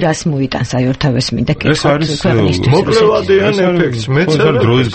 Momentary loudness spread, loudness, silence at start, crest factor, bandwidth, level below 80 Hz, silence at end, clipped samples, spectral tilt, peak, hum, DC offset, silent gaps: 5 LU; -12 LUFS; 0 s; 12 dB; 8.8 kHz; -36 dBFS; 0 s; under 0.1%; -6 dB/octave; 0 dBFS; none; under 0.1%; none